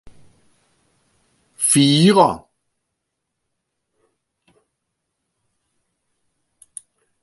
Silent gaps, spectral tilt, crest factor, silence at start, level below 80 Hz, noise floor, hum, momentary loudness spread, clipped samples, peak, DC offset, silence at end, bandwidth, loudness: none; -4.5 dB/octave; 22 dB; 1.6 s; -60 dBFS; -78 dBFS; none; 26 LU; under 0.1%; 0 dBFS; under 0.1%; 4.85 s; 12 kHz; -14 LUFS